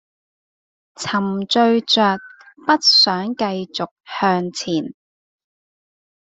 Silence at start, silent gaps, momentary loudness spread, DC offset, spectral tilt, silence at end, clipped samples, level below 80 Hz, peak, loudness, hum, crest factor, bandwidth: 1 s; 3.91-3.96 s; 15 LU; under 0.1%; -4 dB/octave; 1.35 s; under 0.1%; -64 dBFS; -2 dBFS; -17 LUFS; none; 18 dB; 8.2 kHz